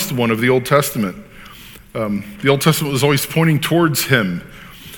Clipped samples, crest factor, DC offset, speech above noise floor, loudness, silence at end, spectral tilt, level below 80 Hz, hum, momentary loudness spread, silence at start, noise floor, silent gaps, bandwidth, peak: under 0.1%; 18 dB; under 0.1%; 23 dB; -16 LUFS; 0 s; -5 dB/octave; -46 dBFS; none; 20 LU; 0 s; -39 dBFS; none; 19.5 kHz; 0 dBFS